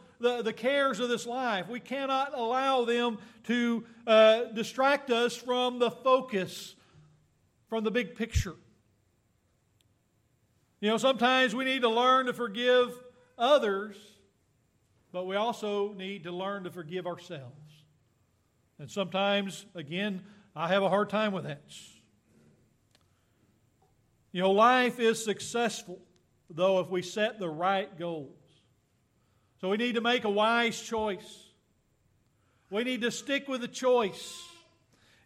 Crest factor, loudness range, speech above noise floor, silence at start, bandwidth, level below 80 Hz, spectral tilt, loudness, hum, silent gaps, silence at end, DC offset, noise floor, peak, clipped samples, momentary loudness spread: 20 dB; 10 LU; 42 dB; 0.2 s; 15 kHz; -56 dBFS; -4 dB/octave; -29 LUFS; none; none; 0.75 s; under 0.1%; -71 dBFS; -10 dBFS; under 0.1%; 17 LU